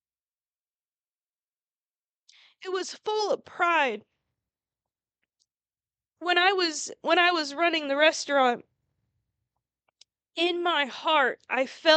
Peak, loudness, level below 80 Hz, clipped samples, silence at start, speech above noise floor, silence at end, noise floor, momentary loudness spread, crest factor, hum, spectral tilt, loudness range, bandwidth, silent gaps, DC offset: -8 dBFS; -25 LUFS; -86 dBFS; under 0.1%; 2.6 s; over 65 dB; 0 s; under -90 dBFS; 11 LU; 22 dB; none; -1 dB/octave; 7 LU; 9 kHz; none; under 0.1%